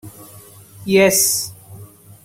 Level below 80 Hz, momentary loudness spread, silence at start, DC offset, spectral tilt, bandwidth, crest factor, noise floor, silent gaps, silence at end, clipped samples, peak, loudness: -56 dBFS; 20 LU; 0.05 s; under 0.1%; -2.5 dB/octave; 16.5 kHz; 18 dB; -42 dBFS; none; 0.4 s; under 0.1%; -2 dBFS; -14 LUFS